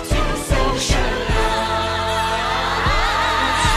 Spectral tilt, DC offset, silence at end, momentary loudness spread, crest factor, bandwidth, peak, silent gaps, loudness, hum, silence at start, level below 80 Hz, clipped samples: -3.5 dB/octave; under 0.1%; 0 s; 3 LU; 14 dB; 15 kHz; -4 dBFS; none; -19 LUFS; none; 0 s; -24 dBFS; under 0.1%